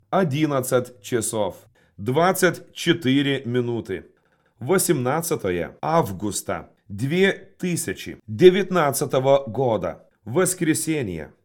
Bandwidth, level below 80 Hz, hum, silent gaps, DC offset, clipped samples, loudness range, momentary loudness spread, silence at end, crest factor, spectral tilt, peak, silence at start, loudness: 18 kHz; -60 dBFS; none; none; under 0.1%; under 0.1%; 4 LU; 12 LU; 0.2 s; 22 dB; -5 dB/octave; 0 dBFS; 0.1 s; -22 LUFS